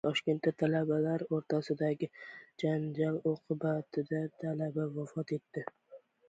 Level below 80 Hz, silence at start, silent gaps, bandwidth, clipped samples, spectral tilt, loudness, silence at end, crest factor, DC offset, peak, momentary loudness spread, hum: -76 dBFS; 0.05 s; none; 8 kHz; under 0.1%; -7.5 dB/octave; -35 LUFS; 0.3 s; 18 dB; under 0.1%; -16 dBFS; 9 LU; none